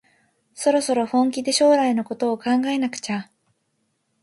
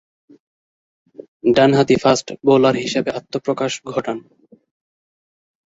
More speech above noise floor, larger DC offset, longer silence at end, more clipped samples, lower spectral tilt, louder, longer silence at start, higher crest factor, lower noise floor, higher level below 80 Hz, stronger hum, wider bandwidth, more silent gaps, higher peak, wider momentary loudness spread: second, 51 dB vs over 73 dB; neither; second, 1 s vs 1.5 s; neither; second, -3.5 dB/octave vs -5 dB/octave; second, -21 LUFS vs -17 LUFS; second, 0.55 s vs 1.2 s; about the same, 16 dB vs 18 dB; second, -71 dBFS vs under -90 dBFS; second, -72 dBFS vs -56 dBFS; neither; first, 11.5 kHz vs 8 kHz; second, none vs 1.28-1.40 s; second, -6 dBFS vs -2 dBFS; about the same, 9 LU vs 11 LU